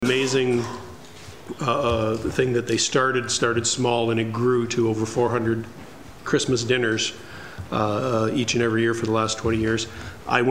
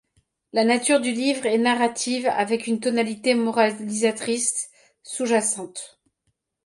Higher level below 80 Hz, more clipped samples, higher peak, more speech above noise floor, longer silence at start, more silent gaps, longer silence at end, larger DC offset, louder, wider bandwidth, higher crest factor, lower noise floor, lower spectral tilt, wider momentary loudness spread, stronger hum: first, -48 dBFS vs -72 dBFS; neither; first, -2 dBFS vs -6 dBFS; second, 20 dB vs 52 dB; second, 0 s vs 0.55 s; neither; second, 0 s vs 0.8 s; first, 0.5% vs under 0.1%; about the same, -23 LUFS vs -22 LUFS; first, 15.5 kHz vs 11.5 kHz; about the same, 22 dB vs 18 dB; second, -42 dBFS vs -74 dBFS; first, -4.5 dB/octave vs -2.5 dB/octave; first, 17 LU vs 10 LU; neither